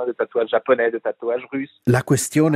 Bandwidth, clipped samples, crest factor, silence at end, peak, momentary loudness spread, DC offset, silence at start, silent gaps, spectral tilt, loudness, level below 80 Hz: 16 kHz; under 0.1%; 18 dB; 0 s; -2 dBFS; 8 LU; under 0.1%; 0 s; none; -6 dB/octave; -21 LUFS; -58 dBFS